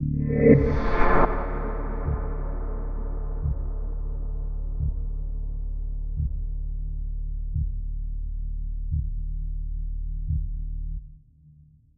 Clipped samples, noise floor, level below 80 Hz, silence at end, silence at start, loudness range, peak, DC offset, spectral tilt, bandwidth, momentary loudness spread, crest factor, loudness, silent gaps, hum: under 0.1%; -54 dBFS; -28 dBFS; 0.45 s; 0 s; 8 LU; -4 dBFS; under 0.1%; -10.5 dB/octave; 4.8 kHz; 13 LU; 22 dB; -29 LUFS; none; none